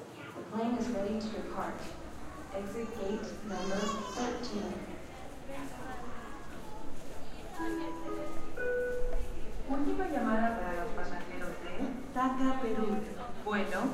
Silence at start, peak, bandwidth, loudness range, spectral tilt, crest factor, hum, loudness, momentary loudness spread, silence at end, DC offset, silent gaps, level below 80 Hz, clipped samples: 0 s; -16 dBFS; 13.5 kHz; 8 LU; -5.5 dB/octave; 16 dB; none; -37 LUFS; 14 LU; 0 s; under 0.1%; none; -44 dBFS; under 0.1%